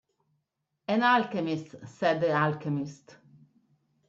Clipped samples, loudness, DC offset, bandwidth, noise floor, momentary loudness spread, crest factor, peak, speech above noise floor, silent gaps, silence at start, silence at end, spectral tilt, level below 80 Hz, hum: under 0.1%; -28 LUFS; under 0.1%; 7.8 kHz; -81 dBFS; 16 LU; 18 dB; -12 dBFS; 53 dB; none; 0.9 s; 1.15 s; -6.5 dB/octave; -74 dBFS; none